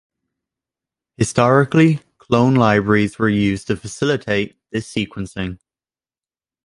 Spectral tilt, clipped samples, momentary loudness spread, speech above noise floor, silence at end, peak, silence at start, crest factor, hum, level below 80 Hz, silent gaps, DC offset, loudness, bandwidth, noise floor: -6 dB/octave; under 0.1%; 12 LU; over 73 dB; 1.1 s; 0 dBFS; 1.2 s; 18 dB; none; -46 dBFS; none; under 0.1%; -18 LUFS; 11.5 kHz; under -90 dBFS